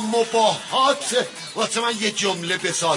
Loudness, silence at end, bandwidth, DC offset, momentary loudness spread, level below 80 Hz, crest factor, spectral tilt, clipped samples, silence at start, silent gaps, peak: -21 LUFS; 0 s; 11 kHz; under 0.1%; 5 LU; -72 dBFS; 16 dB; -2 dB/octave; under 0.1%; 0 s; none; -4 dBFS